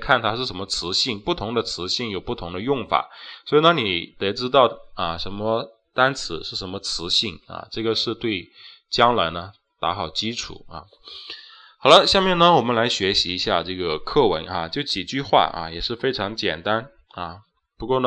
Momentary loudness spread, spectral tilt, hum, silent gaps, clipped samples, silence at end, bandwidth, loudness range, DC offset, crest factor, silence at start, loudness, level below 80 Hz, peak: 17 LU; -4 dB/octave; none; none; under 0.1%; 0 s; 9.6 kHz; 6 LU; under 0.1%; 22 dB; 0 s; -21 LUFS; -46 dBFS; 0 dBFS